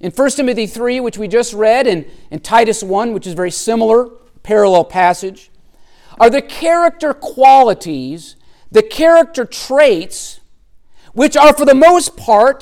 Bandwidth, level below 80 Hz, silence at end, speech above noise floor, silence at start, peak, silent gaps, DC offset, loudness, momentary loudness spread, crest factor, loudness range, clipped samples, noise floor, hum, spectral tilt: 16.5 kHz; -44 dBFS; 0.05 s; 31 dB; 0.05 s; 0 dBFS; none; under 0.1%; -12 LUFS; 16 LU; 12 dB; 3 LU; under 0.1%; -43 dBFS; none; -4 dB/octave